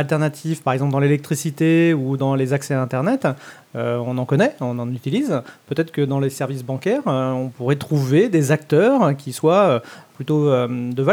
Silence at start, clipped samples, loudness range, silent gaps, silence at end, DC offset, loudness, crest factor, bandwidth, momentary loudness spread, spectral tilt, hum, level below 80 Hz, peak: 0 s; under 0.1%; 4 LU; none; 0 s; under 0.1%; -19 LUFS; 16 dB; 17 kHz; 9 LU; -7 dB/octave; none; -68 dBFS; -2 dBFS